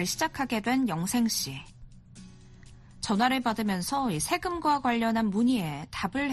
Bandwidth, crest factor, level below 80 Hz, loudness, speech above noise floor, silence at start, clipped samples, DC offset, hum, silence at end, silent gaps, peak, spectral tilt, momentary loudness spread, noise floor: 13 kHz; 18 dB; -54 dBFS; -28 LUFS; 22 dB; 0 s; under 0.1%; under 0.1%; none; 0 s; none; -12 dBFS; -4 dB/octave; 7 LU; -50 dBFS